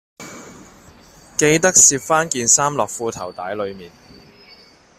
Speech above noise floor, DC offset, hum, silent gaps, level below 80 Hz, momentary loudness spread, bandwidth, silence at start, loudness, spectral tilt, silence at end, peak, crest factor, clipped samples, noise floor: 30 dB; under 0.1%; none; none; -54 dBFS; 19 LU; 16 kHz; 0.2 s; -15 LUFS; -2 dB/octave; 1.1 s; 0 dBFS; 20 dB; under 0.1%; -48 dBFS